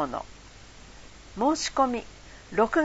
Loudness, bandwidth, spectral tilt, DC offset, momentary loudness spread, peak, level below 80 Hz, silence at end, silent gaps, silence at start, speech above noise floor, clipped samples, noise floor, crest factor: -27 LUFS; 8 kHz; -3.5 dB/octave; under 0.1%; 24 LU; -8 dBFS; -50 dBFS; 0 s; none; 0 s; 22 dB; under 0.1%; -48 dBFS; 20 dB